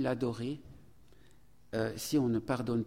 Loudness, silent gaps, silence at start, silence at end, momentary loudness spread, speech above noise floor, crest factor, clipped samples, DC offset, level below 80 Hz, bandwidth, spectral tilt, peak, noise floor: -34 LUFS; none; 0 s; 0 s; 9 LU; 31 dB; 16 dB; under 0.1%; 0.1%; -62 dBFS; 16.5 kHz; -6 dB/octave; -20 dBFS; -64 dBFS